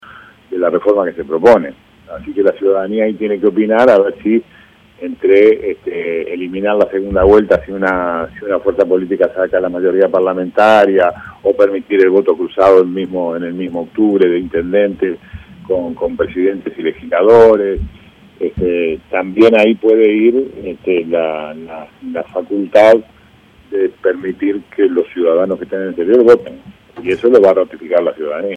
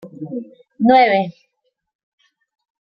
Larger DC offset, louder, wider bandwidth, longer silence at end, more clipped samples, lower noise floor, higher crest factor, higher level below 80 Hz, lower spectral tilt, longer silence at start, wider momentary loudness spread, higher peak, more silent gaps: neither; about the same, -13 LUFS vs -15 LUFS; first, 8.2 kHz vs 5.8 kHz; second, 0 s vs 1.6 s; first, 0.4% vs under 0.1%; second, -45 dBFS vs -72 dBFS; second, 12 dB vs 18 dB; first, -40 dBFS vs -62 dBFS; about the same, -7 dB/octave vs -8 dB/octave; about the same, 0.1 s vs 0.05 s; second, 12 LU vs 17 LU; about the same, 0 dBFS vs -2 dBFS; neither